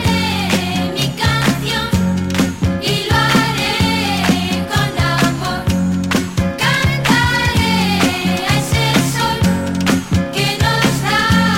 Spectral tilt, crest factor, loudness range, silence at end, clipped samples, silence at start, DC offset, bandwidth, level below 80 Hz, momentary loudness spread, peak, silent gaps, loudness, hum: -4.5 dB/octave; 16 dB; 1 LU; 0 s; under 0.1%; 0 s; under 0.1%; 16.5 kHz; -32 dBFS; 4 LU; 0 dBFS; none; -15 LUFS; none